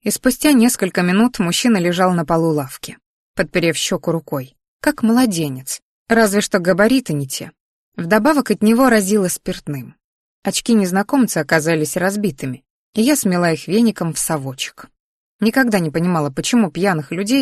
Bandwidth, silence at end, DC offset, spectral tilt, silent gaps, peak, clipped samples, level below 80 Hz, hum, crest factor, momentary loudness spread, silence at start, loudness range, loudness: 13 kHz; 0 s; under 0.1%; -4.5 dB/octave; 3.06-3.34 s, 4.68-4.80 s, 5.82-6.06 s, 7.60-7.92 s, 10.04-10.42 s, 12.70-12.93 s, 15.00-15.39 s; -2 dBFS; under 0.1%; -50 dBFS; none; 16 dB; 13 LU; 0.05 s; 3 LU; -17 LUFS